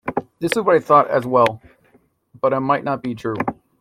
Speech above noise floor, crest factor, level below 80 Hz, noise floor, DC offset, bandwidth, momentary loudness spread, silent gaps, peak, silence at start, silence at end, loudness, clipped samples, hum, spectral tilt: 40 dB; 18 dB; -58 dBFS; -58 dBFS; under 0.1%; 16 kHz; 11 LU; none; -2 dBFS; 0.05 s; 0.25 s; -19 LUFS; under 0.1%; none; -6 dB/octave